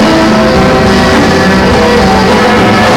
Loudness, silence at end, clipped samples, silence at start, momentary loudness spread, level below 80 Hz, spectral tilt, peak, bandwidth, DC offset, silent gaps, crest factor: -6 LUFS; 0 s; under 0.1%; 0 s; 1 LU; -22 dBFS; -5.5 dB/octave; -2 dBFS; 18 kHz; under 0.1%; none; 4 dB